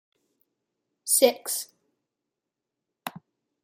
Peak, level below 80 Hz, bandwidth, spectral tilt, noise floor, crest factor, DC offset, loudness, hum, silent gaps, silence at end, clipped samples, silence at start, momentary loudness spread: -4 dBFS; -86 dBFS; 16 kHz; -1 dB/octave; -86 dBFS; 26 dB; under 0.1%; -23 LUFS; none; none; 0.45 s; under 0.1%; 1.05 s; 20 LU